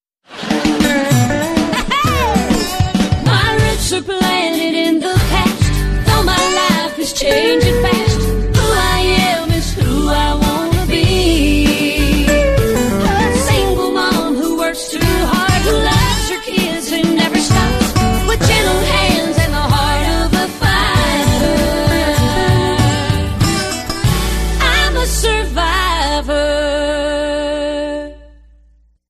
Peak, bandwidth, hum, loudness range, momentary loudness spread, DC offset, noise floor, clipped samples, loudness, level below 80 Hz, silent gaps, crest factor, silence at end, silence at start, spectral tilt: -2 dBFS; 14.5 kHz; none; 2 LU; 4 LU; under 0.1%; -50 dBFS; under 0.1%; -14 LUFS; -22 dBFS; none; 12 dB; 0.85 s; 0.3 s; -4.5 dB/octave